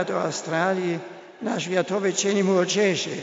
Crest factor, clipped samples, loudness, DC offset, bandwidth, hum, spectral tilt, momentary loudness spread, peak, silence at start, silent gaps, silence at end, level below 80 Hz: 16 dB; under 0.1%; -24 LUFS; under 0.1%; 8 kHz; none; -4 dB/octave; 9 LU; -8 dBFS; 0 s; none; 0 s; -74 dBFS